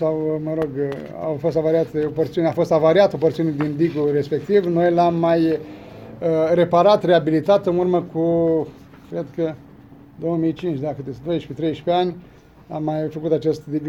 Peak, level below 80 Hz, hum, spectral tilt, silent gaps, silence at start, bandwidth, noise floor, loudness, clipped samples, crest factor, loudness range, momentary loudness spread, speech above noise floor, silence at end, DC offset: -2 dBFS; -54 dBFS; none; -8 dB/octave; none; 0 s; 7.6 kHz; -44 dBFS; -20 LUFS; under 0.1%; 18 dB; 7 LU; 12 LU; 25 dB; 0 s; under 0.1%